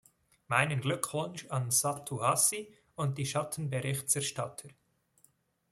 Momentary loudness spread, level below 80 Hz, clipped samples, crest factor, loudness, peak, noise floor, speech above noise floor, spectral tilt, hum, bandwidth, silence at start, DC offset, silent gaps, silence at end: 11 LU; -70 dBFS; under 0.1%; 24 dB; -31 LUFS; -10 dBFS; -69 dBFS; 37 dB; -3.5 dB/octave; none; 15.5 kHz; 0.5 s; under 0.1%; none; 1 s